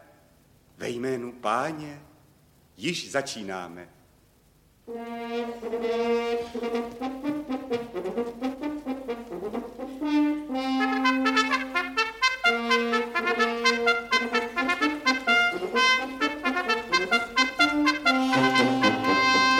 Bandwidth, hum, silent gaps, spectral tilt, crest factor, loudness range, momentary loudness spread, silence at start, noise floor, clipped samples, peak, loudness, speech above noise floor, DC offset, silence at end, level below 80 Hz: 16.5 kHz; none; none; -3 dB/octave; 20 dB; 10 LU; 13 LU; 0.8 s; -60 dBFS; under 0.1%; -6 dBFS; -25 LUFS; 30 dB; under 0.1%; 0 s; -60 dBFS